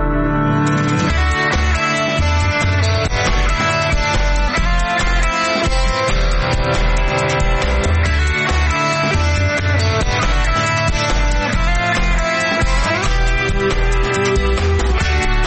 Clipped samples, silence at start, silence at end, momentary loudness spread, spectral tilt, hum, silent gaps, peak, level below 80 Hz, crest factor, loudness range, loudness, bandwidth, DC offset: under 0.1%; 0 s; 0 s; 2 LU; -5 dB/octave; none; none; -6 dBFS; -18 dBFS; 10 dB; 1 LU; -16 LUFS; 8.8 kHz; under 0.1%